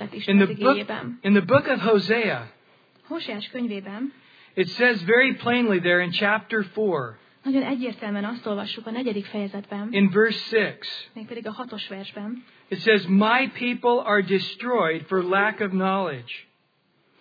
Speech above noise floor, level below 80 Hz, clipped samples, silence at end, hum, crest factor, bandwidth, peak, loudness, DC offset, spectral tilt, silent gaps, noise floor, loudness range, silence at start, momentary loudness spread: 43 dB; -80 dBFS; under 0.1%; 0.8 s; none; 18 dB; 5 kHz; -4 dBFS; -23 LUFS; under 0.1%; -7.5 dB/octave; none; -66 dBFS; 4 LU; 0 s; 16 LU